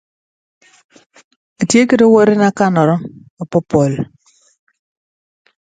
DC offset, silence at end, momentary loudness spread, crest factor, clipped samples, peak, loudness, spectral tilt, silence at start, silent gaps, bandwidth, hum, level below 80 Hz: under 0.1%; 1.75 s; 16 LU; 16 dB; under 0.1%; 0 dBFS; -13 LUFS; -6 dB/octave; 1.6 s; 3.30-3.37 s; 9.4 kHz; none; -54 dBFS